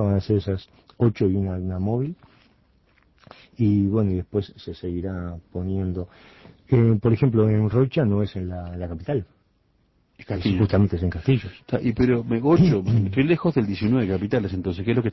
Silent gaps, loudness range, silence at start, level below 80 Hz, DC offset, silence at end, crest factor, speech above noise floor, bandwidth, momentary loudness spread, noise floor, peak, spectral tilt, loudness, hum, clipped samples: none; 5 LU; 0 s; -40 dBFS; under 0.1%; 0 s; 16 dB; 42 dB; 6 kHz; 12 LU; -64 dBFS; -6 dBFS; -10 dB/octave; -23 LUFS; none; under 0.1%